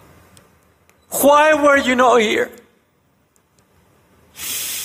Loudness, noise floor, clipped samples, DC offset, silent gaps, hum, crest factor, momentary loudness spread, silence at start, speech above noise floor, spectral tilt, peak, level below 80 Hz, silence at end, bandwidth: -15 LUFS; -60 dBFS; under 0.1%; under 0.1%; none; none; 16 dB; 14 LU; 1.1 s; 47 dB; -2.5 dB/octave; -4 dBFS; -56 dBFS; 0 s; 16.5 kHz